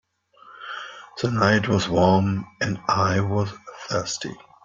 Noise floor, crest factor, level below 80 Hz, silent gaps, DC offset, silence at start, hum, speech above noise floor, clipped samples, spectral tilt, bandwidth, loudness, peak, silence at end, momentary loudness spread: -52 dBFS; 20 dB; -54 dBFS; none; under 0.1%; 0.45 s; none; 30 dB; under 0.1%; -5.5 dB/octave; 7.6 kHz; -22 LUFS; -4 dBFS; 0.3 s; 16 LU